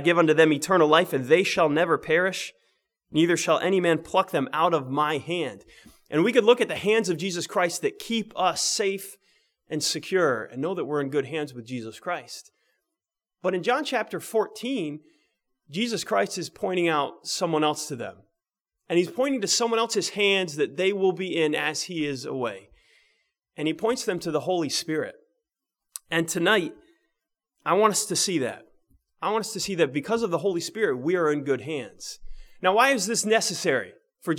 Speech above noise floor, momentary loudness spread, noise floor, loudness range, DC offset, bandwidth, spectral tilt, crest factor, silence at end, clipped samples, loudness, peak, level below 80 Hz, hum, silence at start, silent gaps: 62 dB; 13 LU; -87 dBFS; 6 LU; under 0.1%; 18.5 kHz; -3.5 dB/octave; 22 dB; 0 s; under 0.1%; -25 LUFS; -2 dBFS; -60 dBFS; none; 0 s; none